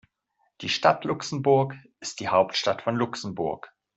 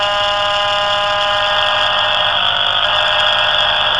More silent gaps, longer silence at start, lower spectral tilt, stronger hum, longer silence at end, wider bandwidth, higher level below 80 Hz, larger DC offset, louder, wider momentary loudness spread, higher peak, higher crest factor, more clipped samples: neither; first, 0.6 s vs 0 s; first, -4.5 dB/octave vs -1.5 dB/octave; neither; first, 0.3 s vs 0 s; second, 8.2 kHz vs 11 kHz; second, -66 dBFS vs -44 dBFS; second, under 0.1% vs 0.8%; second, -25 LUFS vs -13 LUFS; first, 13 LU vs 3 LU; second, -4 dBFS vs 0 dBFS; first, 22 dB vs 14 dB; neither